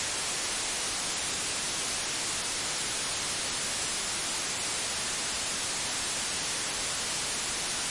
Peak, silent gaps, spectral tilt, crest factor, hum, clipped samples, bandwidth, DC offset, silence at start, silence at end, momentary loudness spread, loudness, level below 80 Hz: -16 dBFS; none; 0 dB/octave; 16 dB; none; under 0.1%; 11.5 kHz; under 0.1%; 0 s; 0 s; 0 LU; -29 LUFS; -56 dBFS